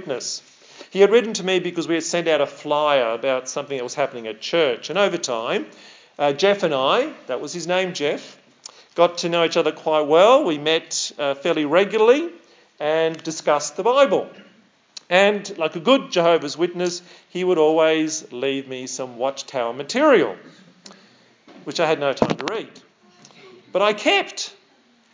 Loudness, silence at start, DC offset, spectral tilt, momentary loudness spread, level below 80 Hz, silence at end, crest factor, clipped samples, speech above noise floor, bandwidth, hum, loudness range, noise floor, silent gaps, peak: -20 LUFS; 0 s; under 0.1%; -3.5 dB/octave; 13 LU; -70 dBFS; 0.65 s; 20 dB; under 0.1%; 37 dB; 7.8 kHz; none; 5 LU; -57 dBFS; none; 0 dBFS